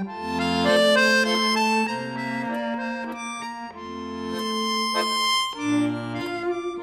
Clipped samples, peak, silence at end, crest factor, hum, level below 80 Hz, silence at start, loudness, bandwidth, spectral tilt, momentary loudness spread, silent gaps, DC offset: under 0.1%; -8 dBFS; 0 s; 16 dB; none; -60 dBFS; 0 s; -23 LUFS; 16 kHz; -3.5 dB/octave; 14 LU; none; under 0.1%